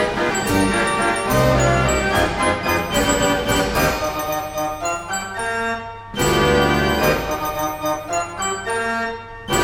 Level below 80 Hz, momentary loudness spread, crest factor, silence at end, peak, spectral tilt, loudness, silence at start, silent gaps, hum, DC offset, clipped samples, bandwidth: -34 dBFS; 8 LU; 16 dB; 0 s; -4 dBFS; -4 dB/octave; -19 LUFS; 0 s; none; none; under 0.1%; under 0.1%; 16.5 kHz